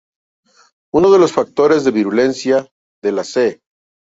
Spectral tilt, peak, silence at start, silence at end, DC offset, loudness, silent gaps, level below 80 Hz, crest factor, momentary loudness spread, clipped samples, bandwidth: -5.5 dB/octave; 0 dBFS; 0.95 s; 0.5 s; under 0.1%; -15 LUFS; 2.71-3.02 s; -54 dBFS; 16 dB; 9 LU; under 0.1%; 8 kHz